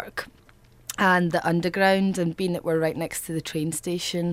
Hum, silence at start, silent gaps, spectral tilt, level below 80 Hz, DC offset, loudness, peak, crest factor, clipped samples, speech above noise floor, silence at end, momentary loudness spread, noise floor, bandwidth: none; 0 s; none; -5 dB/octave; -56 dBFS; under 0.1%; -24 LUFS; -6 dBFS; 18 dB; under 0.1%; 30 dB; 0 s; 14 LU; -54 dBFS; 16 kHz